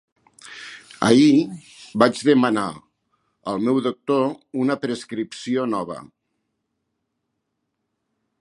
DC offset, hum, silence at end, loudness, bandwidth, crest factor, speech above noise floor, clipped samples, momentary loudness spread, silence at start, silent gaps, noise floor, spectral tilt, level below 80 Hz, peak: under 0.1%; none; 2.35 s; -20 LUFS; 11.5 kHz; 22 dB; 57 dB; under 0.1%; 21 LU; 0.45 s; none; -77 dBFS; -5.5 dB/octave; -66 dBFS; 0 dBFS